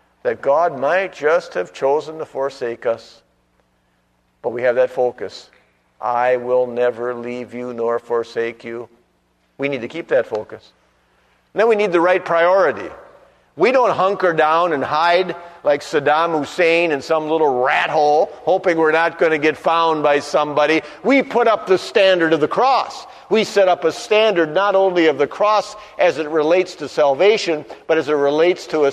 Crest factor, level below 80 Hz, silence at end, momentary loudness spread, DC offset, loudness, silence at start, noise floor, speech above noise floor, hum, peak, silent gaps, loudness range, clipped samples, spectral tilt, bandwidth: 16 dB; -64 dBFS; 0 s; 11 LU; under 0.1%; -17 LUFS; 0.25 s; -62 dBFS; 45 dB; 60 Hz at -60 dBFS; -2 dBFS; none; 8 LU; under 0.1%; -4.5 dB/octave; 11.5 kHz